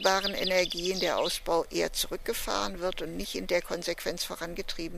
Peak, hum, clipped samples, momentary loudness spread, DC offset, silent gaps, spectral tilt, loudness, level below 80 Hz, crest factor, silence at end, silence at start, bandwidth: -8 dBFS; none; under 0.1%; 8 LU; under 0.1%; none; -2.5 dB/octave; -30 LUFS; -46 dBFS; 24 dB; 0 s; 0 s; 15.5 kHz